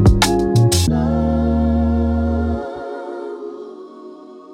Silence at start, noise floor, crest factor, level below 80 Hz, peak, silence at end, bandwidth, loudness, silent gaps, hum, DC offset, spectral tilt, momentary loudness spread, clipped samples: 0 s; -37 dBFS; 16 dB; -24 dBFS; 0 dBFS; 0 s; 16.5 kHz; -18 LUFS; none; none; under 0.1%; -6 dB/octave; 22 LU; under 0.1%